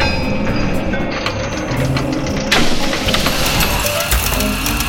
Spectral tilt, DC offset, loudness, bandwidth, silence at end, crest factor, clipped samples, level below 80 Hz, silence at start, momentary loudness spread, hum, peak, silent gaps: -3.5 dB/octave; under 0.1%; -16 LUFS; 17 kHz; 0 s; 14 dB; under 0.1%; -24 dBFS; 0 s; 5 LU; none; -2 dBFS; none